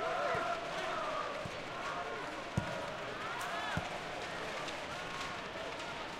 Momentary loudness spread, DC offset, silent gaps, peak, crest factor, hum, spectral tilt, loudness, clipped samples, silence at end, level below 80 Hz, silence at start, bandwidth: 5 LU; under 0.1%; none; -20 dBFS; 20 dB; none; -4 dB/octave; -39 LUFS; under 0.1%; 0 s; -62 dBFS; 0 s; 16 kHz